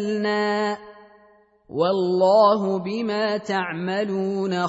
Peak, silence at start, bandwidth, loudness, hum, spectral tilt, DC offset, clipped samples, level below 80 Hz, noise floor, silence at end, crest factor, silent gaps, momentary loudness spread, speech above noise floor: -6 dBFS; 0 s; 8 kHz; -22 LUFS; none; -6 dB/octave; under 0.1%; under 0.1%; -68 dBFS; -56 dBFS; 0 s; 16 dB; none; 9 LU; 34 dB